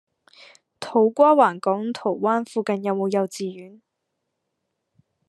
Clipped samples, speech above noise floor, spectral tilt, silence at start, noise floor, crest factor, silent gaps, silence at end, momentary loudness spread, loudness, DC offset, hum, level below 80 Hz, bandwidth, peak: under 0.1%; 58 dB; -6 dB/octave; 0.8 s; -78 dBFS; 20 dB; none; 1.6 s; 16 LU; -21 LUFS; under 0.1%; none; -82 dBFS; 12.5 kHz; -4 dBFS